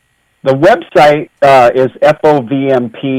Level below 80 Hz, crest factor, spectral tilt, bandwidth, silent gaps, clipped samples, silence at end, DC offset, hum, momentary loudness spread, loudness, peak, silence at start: -46 dBFS; 10 dB; -6.5 dB/octave; 14.5 kHz; none; under 0.1%; 0 s; under 0.1%; none; 7 LU; -9 LUFS; 0 dBFS; 0.45 s